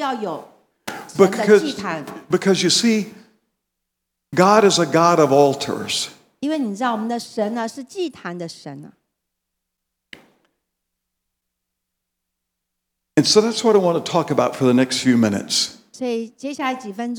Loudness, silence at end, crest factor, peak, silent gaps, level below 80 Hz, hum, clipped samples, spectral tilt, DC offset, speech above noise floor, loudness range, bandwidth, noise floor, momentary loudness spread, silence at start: -18 LUFS; 0 s; 20 dB; 0 dBFS; none; -70 dBFS; none; under 0.1%; -4 dB/octave; under 0.1%; 61 dB; 12 LU; 19 kHz; -79 dBFS; 15 LU; 0 s